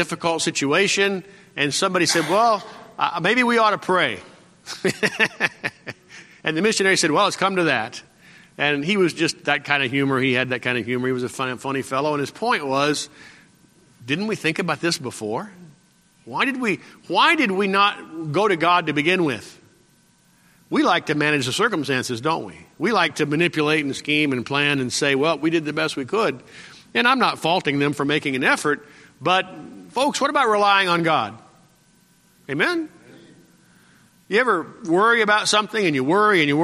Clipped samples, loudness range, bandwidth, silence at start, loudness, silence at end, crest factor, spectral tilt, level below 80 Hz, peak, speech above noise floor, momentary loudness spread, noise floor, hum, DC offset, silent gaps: under 0.1%; 5 LU; 14.5 kHz; 0 s; -20 LUFS; 0 s; 20 dB; -4 dB/octave; -66 dBFS; -2 dBFS; 37 dB; 11 LU; -58 dBFS; none; under 0.1%; none